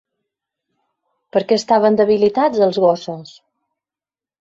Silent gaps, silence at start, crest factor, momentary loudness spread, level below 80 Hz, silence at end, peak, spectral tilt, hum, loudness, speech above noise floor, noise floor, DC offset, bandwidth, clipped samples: none; 1.35 s; 16 dB; 10 LU; -60 dBFS; 1.15 s; -2 dBFS; -5.5 dB/octave; none; -16 LUFS; over 75 dB; under -90 dBFS; under 0.1%; 7.8 kHz; under 0.1%